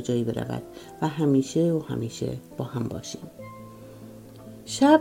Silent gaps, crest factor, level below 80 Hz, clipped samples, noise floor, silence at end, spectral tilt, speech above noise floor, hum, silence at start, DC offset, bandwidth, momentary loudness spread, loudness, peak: none; 22 dB; -58 dBFS; under 0.1%; -44 dBFS; 0 s; -6 dB/octave; 19 dB; none; 0 s; under 0.1%; 16 kHz; 22 LU; -27 LUFS; -4 dBFS